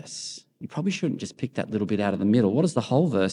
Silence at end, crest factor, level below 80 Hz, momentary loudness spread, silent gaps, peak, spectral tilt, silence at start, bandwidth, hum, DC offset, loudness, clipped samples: 0 s; 18 dB; -70 dBFS; 14 LU; none; -8 dBFS; -6.5 dB/octave; 0.05 s; 11 kHz; none; under 0.1%; -25 LUFS; under 0.1%